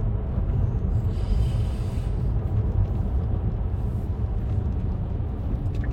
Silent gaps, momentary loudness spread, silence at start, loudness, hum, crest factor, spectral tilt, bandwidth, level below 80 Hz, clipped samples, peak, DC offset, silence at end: none; 3 LU; 0 s; -27 LUFS; none; 12 dB; -9.5 dB/octave; 8.6 kHz; -28 dBFS; under 0.1%; -12 dBFS; under 0.1%; 0 s